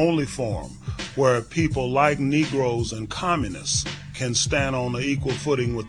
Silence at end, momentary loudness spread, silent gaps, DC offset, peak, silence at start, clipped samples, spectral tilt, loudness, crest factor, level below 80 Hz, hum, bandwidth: 0 s; 9 LU; none; 0.2%; -4 dBFS; 0 s; under 0.1%; -4.5 dB/octave; -24 LUFS; 20 dB; -42 dBFS; none; 12 kHz